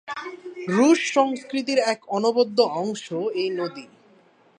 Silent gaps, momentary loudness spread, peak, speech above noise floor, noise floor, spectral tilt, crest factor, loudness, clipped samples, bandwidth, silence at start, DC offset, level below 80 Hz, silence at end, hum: none; 15 LU; -4 dBFS; 34 dB; -57 dBFS; -4.5 dB/octave; 18 dB; -22 LUFS; under 0.1%; 10.5 kHz; 0.05 s; under 0.1%; -78 dBFS; 0.75 s; none